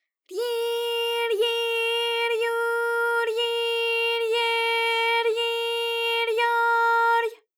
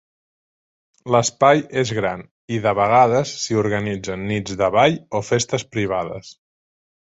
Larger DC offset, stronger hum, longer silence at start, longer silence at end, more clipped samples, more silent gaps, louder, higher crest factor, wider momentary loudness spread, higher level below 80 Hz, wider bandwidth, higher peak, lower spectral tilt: neither; neither; second, 0.3 s vs 1.05 s; second, 0.25 s vs 0.7 s; neither; second, none vs 2.31-2.48 s; second, -23 LUFS vs -19 LUFS; second, 12 dB vs 20 dB; second, 5 LU vs 11 LU; second, under -90 dBFS vs -52 dBFS; first, 18 kHz vs 8.2 kHz; second, -12 dBFS vs -2 dBFS; second, 2.5 dB/octave vs -4.5 dB/octave